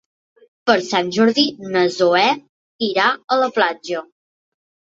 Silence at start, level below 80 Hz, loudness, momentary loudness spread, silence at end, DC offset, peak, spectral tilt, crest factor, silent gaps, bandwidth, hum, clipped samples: 0.65 s; -66 dBFS; -18 LUFS; 11 LU; 0.9 s; under 0.1%; -2 dBFS; -4 dB/octave; 18 dB; 2.49-2.79 s; 7.8 kHz; none; under 0.1%